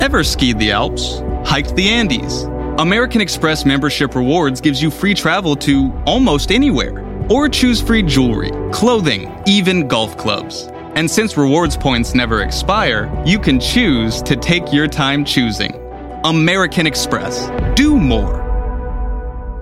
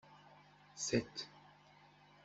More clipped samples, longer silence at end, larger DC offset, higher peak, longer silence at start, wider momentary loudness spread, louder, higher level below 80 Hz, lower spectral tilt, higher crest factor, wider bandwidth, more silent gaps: neither; second, 0 s vs 0.75 s; neither; first, 0 dBFS vs -20 dBFS; about the same, 0 s vs 0.1 s; second, 8 LU vs 26 LU; first, -15 LUFS vs -41 LUFS; first, -24 dBFS vs -72 dBFS; about the same, -4.5 dB/octave vs -3.5 dB/octave; second, 14 dB vs 26 dB; first, 16 kHz vs 8.2 kHz; neither